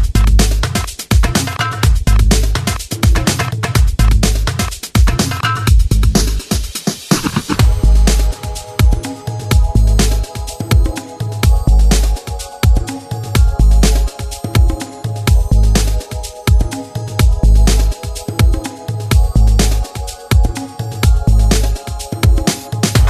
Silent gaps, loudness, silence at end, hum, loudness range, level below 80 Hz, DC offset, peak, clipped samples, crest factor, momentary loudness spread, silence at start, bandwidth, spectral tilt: none; -15 LUFS; 0 s; none; 2 LU; -14 dBFS; under 0.1%; 0 dBFS; under 0.1%; 12 dB; 11 LU; 0 s; 14 kHz; -5 dB/octave